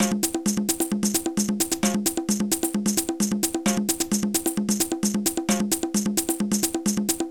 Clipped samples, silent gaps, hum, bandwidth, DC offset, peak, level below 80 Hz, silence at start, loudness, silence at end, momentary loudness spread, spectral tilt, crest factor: under 0.1%; none; none; 19 kHz; 0.2%; -10 dBFS; -52 dBFS; 0 s; -24 LUFS; 0 s; 2 LU; -3.5 dB/octave; 14 dB